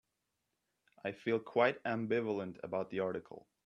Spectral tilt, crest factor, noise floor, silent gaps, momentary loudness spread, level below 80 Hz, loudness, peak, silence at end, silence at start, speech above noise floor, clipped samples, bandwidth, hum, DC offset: -7.5 dB/octave; 22 dB; -86 dBFS; none; 13 LU; -80 dBFS; -37 LUFS; -16 dBFS; 0.25 s; 1.05 s; 49 dB; under 0.1%; 7 kHz; none; under 0.1%